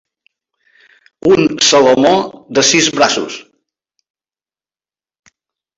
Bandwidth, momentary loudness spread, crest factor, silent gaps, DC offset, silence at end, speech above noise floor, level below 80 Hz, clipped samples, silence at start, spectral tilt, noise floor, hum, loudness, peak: 8 kHz; 10 LU; 16 dB; none; under 0.1%; 2.35 s; over 79 dB; -54 dBFS; under 0.1%; 1.25 s; -2.5 dB/octave; under -90 dBFS; none; -11 LUFS; 0 dBFS